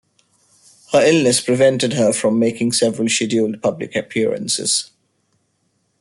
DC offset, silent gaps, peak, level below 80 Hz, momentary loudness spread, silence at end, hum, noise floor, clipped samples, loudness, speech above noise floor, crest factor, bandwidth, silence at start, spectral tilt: under 0.1%; none; -2 dBFS; -60 dBFS; 7 LU; 1.15 s; none; -66 dBFS; under 0.1%; -17 LUFS; 50 dB; 16 dB; 12.5 kHz; 0.9 s; -3.5 dB/octave